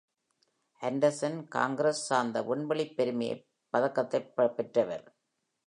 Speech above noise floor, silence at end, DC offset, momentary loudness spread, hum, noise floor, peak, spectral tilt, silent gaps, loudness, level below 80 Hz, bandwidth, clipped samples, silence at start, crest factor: 46 dB; 0.65 s; under 0.1%; 7 LU; none; -76 dBFS; -12 dBFS; -5 dB/octave; none; -31 LUFS; -82 dBFS; 11 kHz; under 0.1%; 0.8 s; 20 dB